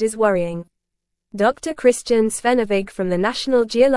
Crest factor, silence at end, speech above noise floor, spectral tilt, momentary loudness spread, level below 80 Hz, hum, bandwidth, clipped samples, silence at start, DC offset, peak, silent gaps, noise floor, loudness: 16 dB; 0 s; 60 dB; -4.5 dB/octave; 6 LU; -50 dBFS; none; 12 kHz; under 0.1%; 0 s; under 0.1%; -2 dBFS; none; -79 dBFS; -19 LUFS